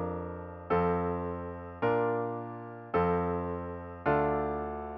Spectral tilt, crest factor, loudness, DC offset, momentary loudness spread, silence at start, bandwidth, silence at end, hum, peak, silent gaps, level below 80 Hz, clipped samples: -10.5 dB/octave; 18 dB; -32 LUFS; under 0.1%; 12 LU; 0 s; 5.2 kHz; 0 s; none; -14 dBFS; none; -52 dBFS; under 0.1%